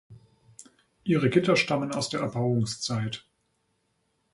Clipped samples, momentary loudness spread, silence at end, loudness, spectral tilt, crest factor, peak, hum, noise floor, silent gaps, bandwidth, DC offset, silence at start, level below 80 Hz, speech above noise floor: under 0.1%; 11 LU; 1.15 s; -26 LUFS; -5.5 dB/octave; 20 dB; -8 dBFS; none; -74 dBFS; none; 11.5 kHz; under 0.1%; 0.1 s; -62 dBFS; 48 dB